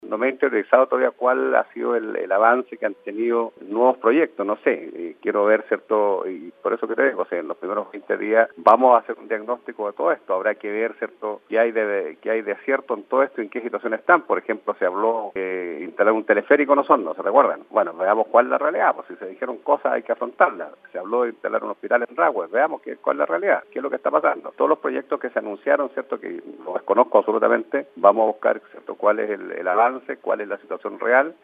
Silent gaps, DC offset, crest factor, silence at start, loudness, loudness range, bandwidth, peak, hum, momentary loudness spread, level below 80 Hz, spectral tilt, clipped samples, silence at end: none; under 0.1%; 20 dB; 0.05 s; -21 LUFS; 4 LU; 4.8 kHz; 0 dBFS; none; 11 LU; -82 dBFS; -7.5 dB/octave; under 0.1%; 0.1 s